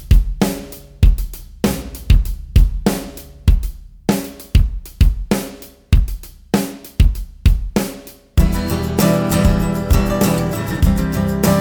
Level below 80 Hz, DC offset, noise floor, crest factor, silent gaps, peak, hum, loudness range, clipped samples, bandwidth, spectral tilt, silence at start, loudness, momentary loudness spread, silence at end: -18 dBFS; under 0.1%; -35 dBFS; 14 dB; none; 0 dBFS; none; 3 LU; under 0.1%; over 20 kHz; -6 dB/octave; 0 s; -18 LUFS; 11 LU; 0 s